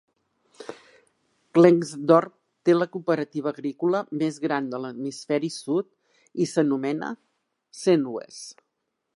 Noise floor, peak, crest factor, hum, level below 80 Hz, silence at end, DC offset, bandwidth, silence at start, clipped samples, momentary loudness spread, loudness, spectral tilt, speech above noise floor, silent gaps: -79 dBFS; -2 dBFS; 22 dB; none; -80 dBFS; 0.65 s; under 0.1%; 11.5 kHz; 0.6 s; under 0.1%; 21 LU; -24 LUFS; -6.5 dB/octave; 56 dB; none